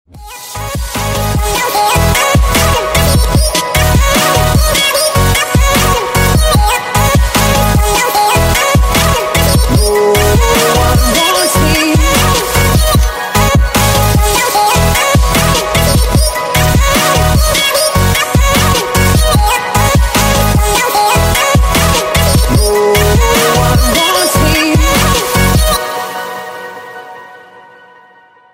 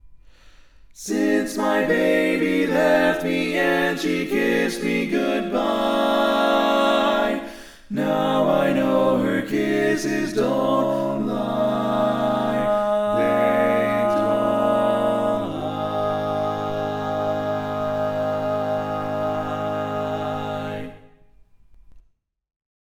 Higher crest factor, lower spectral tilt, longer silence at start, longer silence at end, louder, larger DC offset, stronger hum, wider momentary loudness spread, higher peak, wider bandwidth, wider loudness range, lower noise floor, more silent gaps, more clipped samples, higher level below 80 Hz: second, 10 dB vs 16 dB; second, -4 dB/octave vs -5.5 dB/octave; about the same, 0.15 s vs 0.05 s; about the same, 0.95 s vs 1 s; first, -10 LUFS vs -21 LUFS; neither; neither; second, 4 LU vs 7 LU; first, 0 dBFS vs -6 dBFS; second, 16.5 kHz vs 19 kHz; second, 2 LU vs 5 LU; second, -43 dBFS vs -62 dBFS; neither; neither; first, -16 dBFS vs -52 dBFS